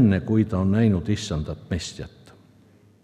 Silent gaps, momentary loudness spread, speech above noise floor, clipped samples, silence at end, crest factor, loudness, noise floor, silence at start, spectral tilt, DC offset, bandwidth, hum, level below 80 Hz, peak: none; 14 LU; 33 dB; under 0.1%; 0.95 s; 16 dB; -24 LUFS; -55 dBFS; 0 s; -7 dB/octave; under 0.1%; 10.5 kHz; none; -46 dBFS; -6 dBFS